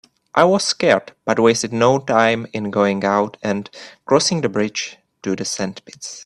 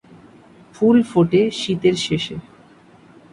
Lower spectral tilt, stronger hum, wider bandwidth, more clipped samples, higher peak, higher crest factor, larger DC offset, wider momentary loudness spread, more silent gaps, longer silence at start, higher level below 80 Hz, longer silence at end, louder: second, -4 dB/octave vs -6 dB/octave; neither; first, 12.5 kHz vs 11 kHz; neither; first, 0 dBFS vs -4 dBFS; about the same, 18 dB vs 16 dB; neither; first, 13 LU vs 10 LU; neither; second, 0.35 s vs 0.8 s; second, -60 dBFS vs -54 dBFS; second, 0 s vs 0.9 s; about the same, -18 LUFS vs -18 LUFS